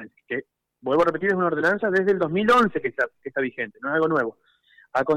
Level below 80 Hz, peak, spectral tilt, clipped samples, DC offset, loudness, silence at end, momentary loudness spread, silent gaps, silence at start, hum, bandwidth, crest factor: -62 dBFS; -12 dBFS; -6.5 dB/octave; under 0.1%; under 0.1%; -23 LUFS; 0 s; 13 LU; none; 0 s; none; 12.5 kHz; 12 dB